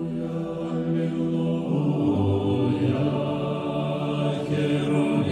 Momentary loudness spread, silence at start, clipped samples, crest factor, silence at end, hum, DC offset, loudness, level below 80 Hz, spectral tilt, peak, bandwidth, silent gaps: 5 LU; 0 s; under 0.1%; 12 dB; 0 s; none; under 0.1%; -25 LUFS; -56 dBFS; -8.5 dB/octave; -12 dBFS; 10 kHz; none